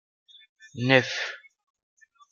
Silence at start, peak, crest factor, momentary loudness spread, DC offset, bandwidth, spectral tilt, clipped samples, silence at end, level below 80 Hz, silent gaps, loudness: 0.75 s; -4 dBFS; 26 dB; 23 LU; under 0.1%; 7.2 kHz; -5 dB/octave; under 0.1%; 0.95 s; -72 dBFS; none; -24 LUFS